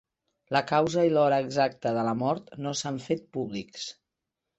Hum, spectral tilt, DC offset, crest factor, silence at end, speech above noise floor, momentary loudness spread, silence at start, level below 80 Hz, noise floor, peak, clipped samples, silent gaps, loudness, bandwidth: none; -5 dB/octave; under 0.1%; 18 dB; 0.65 s; 59 dB; 12 LU; 0.5 s; -68 dBFS; -86 dBFS; -10 dBFS; under 0.1%; none; -27 LUFS; 8.4 kHz